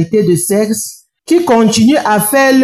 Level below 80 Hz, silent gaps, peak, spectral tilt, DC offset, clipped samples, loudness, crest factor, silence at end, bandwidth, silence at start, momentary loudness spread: -50 dBFS; none; -2 dBFS; -4.5 dB/octave; under 0.1%; under 0.1%; -11 LUFS; 8 dB; 0 s; 15 kHz; 0 s; 7 LU